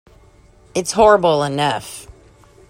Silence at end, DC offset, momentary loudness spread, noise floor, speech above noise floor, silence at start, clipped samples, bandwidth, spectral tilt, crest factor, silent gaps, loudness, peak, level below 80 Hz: 0.7 s; under 0.1%; 18 LU; -48 dBFS; 33 dB; 0.75 s; under 0.1%; 16 kHz; -4 dB/octave; 18 dB; none; -16 LUFS; 0 dBFS; -46 dBFS